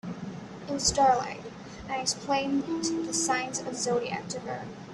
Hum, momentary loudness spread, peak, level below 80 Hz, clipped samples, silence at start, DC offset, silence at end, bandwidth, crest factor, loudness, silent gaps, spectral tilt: none; 16 LU; -10 dBFS; -54 dBFS; under 0.1%; 0.05 s; under 0.1%; 0 s; 13 kHz; 20 dB; -29 LUFS; none; -3 dB/octave